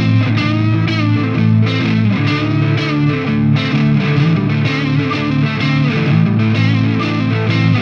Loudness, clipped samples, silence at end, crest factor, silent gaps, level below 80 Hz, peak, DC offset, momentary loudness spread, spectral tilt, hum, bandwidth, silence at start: -14 LUFS; under 0.1%; 0 s; 12 dB; none; -42 dBFS; -2 dBFS; under 0.1%; 2 LU; -8 dB/octave; none; 6.8 kHz; 0 s